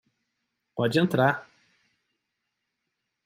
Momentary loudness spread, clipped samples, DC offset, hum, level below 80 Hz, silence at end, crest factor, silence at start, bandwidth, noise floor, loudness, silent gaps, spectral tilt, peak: 13 LU; under 0.1%; under 0.1%; none; -70 dBFS; 1.85 s; 24 dB; 0.75 s; 15.5 kHz; -82 dBFS; -25 LUFS; none; -6.5 dB/octave; -6 dBFS